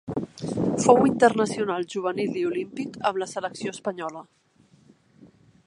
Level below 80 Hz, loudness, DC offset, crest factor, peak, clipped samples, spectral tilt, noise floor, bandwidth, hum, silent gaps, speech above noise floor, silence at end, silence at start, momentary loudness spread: -60 dBFS; -25 LUFS; under 0.1%; 24 dB; -2 dBFS; under 0.1%; -5.5 dB/octave; -57 dBFS; 11.5 kHz; none; none; 33 dB; 1.45 s; 0.05 s; 15 LU